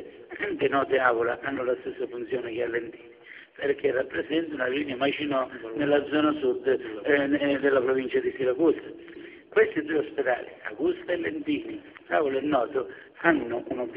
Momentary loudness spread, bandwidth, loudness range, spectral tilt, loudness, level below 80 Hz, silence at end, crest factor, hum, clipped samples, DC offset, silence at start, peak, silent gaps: 11 LU; 5 kHz; 4 LU; -3 dB/octave; -27 LUFS; -64 dBFS; 0 s; 22 dB; none; under 0.1%; under 0.1%; 0 s; -6 dBFS; none